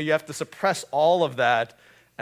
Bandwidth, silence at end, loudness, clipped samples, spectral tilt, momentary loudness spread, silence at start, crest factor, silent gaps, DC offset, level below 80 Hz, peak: 16 kHz; 0.55 s; -23 LUFS; under 0.1%; -4 dB/octave; 8 LU; 0 s; 18 dB; none; under 0.1%; -72 dBFS; -6 dBFS